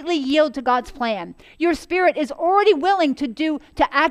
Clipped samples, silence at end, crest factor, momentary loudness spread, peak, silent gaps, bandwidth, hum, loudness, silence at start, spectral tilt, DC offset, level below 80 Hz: under 0.1%; 0 s; 18 dB; 8 LU; -2 dBFS; none; 12.5 kHz; none; -20 LUFS; 0 s; -4 dB/octave; under 0.1%; -48 dBFS